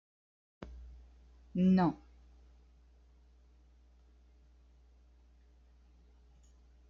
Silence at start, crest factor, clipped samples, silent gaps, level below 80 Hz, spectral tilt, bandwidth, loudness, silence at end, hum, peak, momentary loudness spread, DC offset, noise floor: 0.6 s; 20 dB; under 0.1%; none; -60 dBFS; -8.5 dB/octave; 5.6 kHz; -31 LUFS; 4.95 s; 60 Hz at -60 dBFS; -20 dBFS; 28 LU; under 0.1%; -63 dBFS